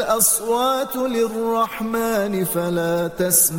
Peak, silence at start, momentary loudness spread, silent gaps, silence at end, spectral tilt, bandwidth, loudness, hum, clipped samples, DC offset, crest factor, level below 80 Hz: -2 dBFS; 0 s; 6 LU; none; 0 s; -3.5 dB/octave; 17 kHz; -20 LUFS; none; under 0.1%; under 0.1%; 18 dB; -52 dBFS